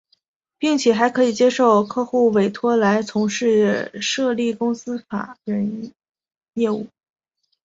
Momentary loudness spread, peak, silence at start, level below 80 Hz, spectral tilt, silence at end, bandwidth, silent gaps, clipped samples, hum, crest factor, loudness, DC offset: 12 LU; -2 dBFS; 0.6 s; -64 dBFS; -5 dB/octave; 0.8 s; 7.8 kHz; 6.37-6.41 s; under 0.1%; none; 18 dB; -19 LUFS; under 0.1%